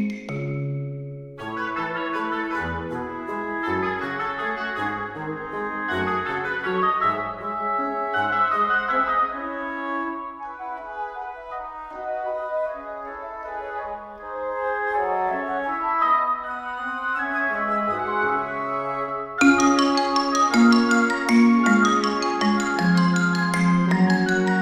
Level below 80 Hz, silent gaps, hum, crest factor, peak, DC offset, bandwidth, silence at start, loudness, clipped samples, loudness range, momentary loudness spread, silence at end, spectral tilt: -56 dBFS; none; none; 20 dB; -4 dBFS; under 0.1%; 13.5 kHz; 0 s; -23 LUFS; under 0.1%; 11 LU; 15 LU; 0 s; -5.5 dB/octave